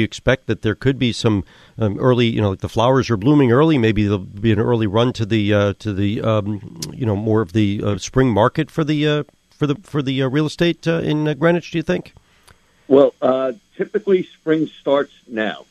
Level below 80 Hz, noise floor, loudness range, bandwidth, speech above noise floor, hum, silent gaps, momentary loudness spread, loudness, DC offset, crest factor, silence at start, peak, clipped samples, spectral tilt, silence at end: -44 dBFS; -52 dBFS; 3 LU; 13 kHz; 34 dB; none; none; 9 LU; -18 LUFS; under 0.1%; 18 dB; 0 s; 0 dBFS; under 0.1%; -7 dB/octave; 0.1 s